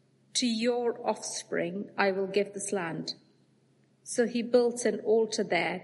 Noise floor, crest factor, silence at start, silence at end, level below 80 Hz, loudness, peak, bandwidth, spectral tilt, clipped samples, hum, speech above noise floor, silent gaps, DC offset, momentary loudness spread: -66 dBFS; 20 dB; 0.35 s; 0 s; -82 dBFS; -30 LUFS; -10 dBFS; 11.5 kHz; -3.5 dB/octave; under 0.1%; none; 37 dB; none; under 0.1%; 9 LU